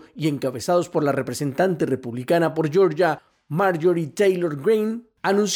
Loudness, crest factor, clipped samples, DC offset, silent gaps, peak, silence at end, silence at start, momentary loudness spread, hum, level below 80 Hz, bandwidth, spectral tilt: -22 LUFS; 12 dB; under 0.1%; under 0.1%; none; -10 dBFS; 0 s; 0.15 s; 7 LU; none; -64 dBFS; 18 kHz; -5.5 dB/octave